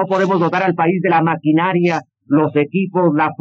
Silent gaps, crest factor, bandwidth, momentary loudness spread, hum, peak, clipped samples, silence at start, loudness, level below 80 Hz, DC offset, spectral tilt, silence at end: none; 12 dB; 7.4 kHz; 3 LU; none; -4 dBFS; under 0.1%; 0 s; -16 LUFS; -80 dBFS; under 0.1%; -8 dB/octave; 0.05 s